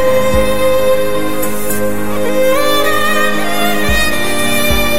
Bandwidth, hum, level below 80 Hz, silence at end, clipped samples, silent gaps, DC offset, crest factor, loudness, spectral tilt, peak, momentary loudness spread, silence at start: 16.5 kHz; none; -28 dBFS; 0 s; under 0.1%; none; 20%; 14 dB; -14 LUFS; -3.5 dB/octave; 0 dBFS; 5 LU; 0 s